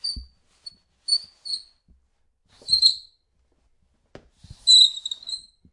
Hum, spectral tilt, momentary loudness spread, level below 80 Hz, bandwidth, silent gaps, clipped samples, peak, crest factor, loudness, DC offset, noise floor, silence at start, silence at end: none; 1 dB/octave; 22 LU; -54 dBFS; 11.5 kHz; none; under 0.1%; -4 dBFS; 20 dB; -18 LUFS; under 0.1%; -67 dBFS; 0.05 s; 0.35 s